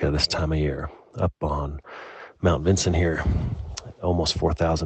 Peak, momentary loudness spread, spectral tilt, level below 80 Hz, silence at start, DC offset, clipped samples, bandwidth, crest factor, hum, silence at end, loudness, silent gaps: -6 dBFS; 15 LU; -5.5 dB/octave; -34 dBFS; 0 s; under 0.1%; under 0.1%; 8.8 kHz; 18 dB; none; 0 s; -25 LUFS; none